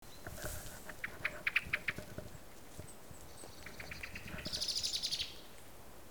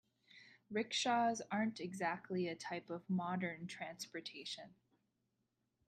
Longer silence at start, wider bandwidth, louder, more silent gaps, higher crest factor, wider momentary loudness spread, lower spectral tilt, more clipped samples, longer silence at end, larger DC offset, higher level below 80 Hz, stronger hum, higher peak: second, 0 s vs 0.35 s; first, over 20 kHz vs 13.5 kHz; about the same, -39 LUFS vs -41 LUFS; neither; first, 24 dB vs 18 dB; first, 19 LU vs 12 LU; second, -1.5 dB/octave vs -4.5 dB/octave; neither; second, 0 s vs 1.15 s; first, 0.2% vs under 0.1%; first, -58 dBFS vs -86 dBFS; neither; first, -18 dBFS vs -24 dBFS